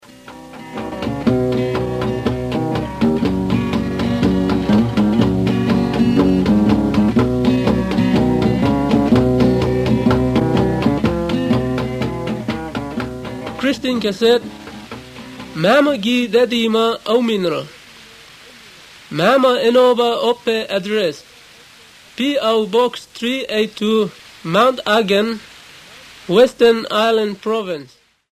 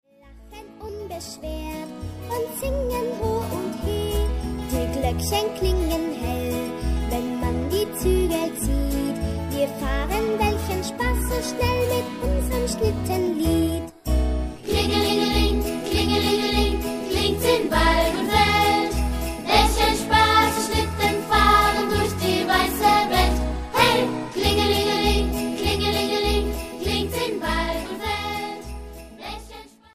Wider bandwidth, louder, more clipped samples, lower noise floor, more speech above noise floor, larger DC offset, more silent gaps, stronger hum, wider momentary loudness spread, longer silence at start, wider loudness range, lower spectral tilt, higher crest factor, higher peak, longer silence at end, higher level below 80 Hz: about the same, 15 kHz vs 15.5 kHz; first, -16 LUFS vs -22 LUFS; neither; about the same, -44 dBFS vs -47 dBFS; first, 28 dB vs 23 dB; neither; neither; neither; about the same, 13 LU vs 11 LU; about the same, 0.25 s vs 0.25 s; about the same, 5 LU vs 7 LU; first, -6.5 dB/octave vs -4.5 dB/octave; about the same, 16 dB vs 20 dB; first, 0 dBFS vs -4 dBFS; first, 0.5 s vs 0.3 s; second, -36 dBFS vs -30 dBFS